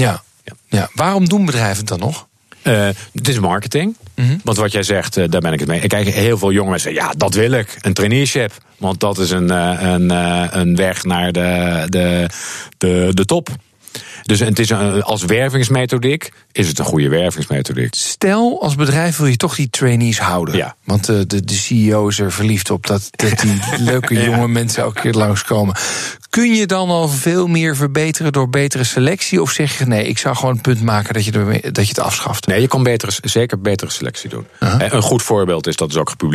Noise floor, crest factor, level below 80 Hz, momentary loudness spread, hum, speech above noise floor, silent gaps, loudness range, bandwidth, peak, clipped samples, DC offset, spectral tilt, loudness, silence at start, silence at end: -39 dBFS; 12 dB; -46 dBFS; 5 LU; none; 24 dB; none; 2 LU; 14.5 kHz; -2 dBFS; under 0.1%; under 0.1%; -5 dB/octave; -15 LUFS; 0 s; 0 s